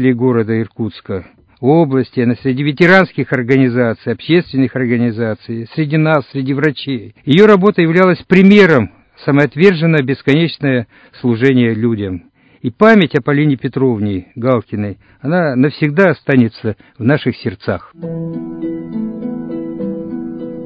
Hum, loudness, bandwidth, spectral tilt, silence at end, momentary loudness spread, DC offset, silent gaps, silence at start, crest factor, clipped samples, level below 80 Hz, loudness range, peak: none; -13 LUFS; 8 kHz; -8.5 dB/octave; 0 s; 15 LU; under 0.1%; none; 0 s; 14 dB; 0.4%; -48 dBFS; 6 LU; 0 dBFS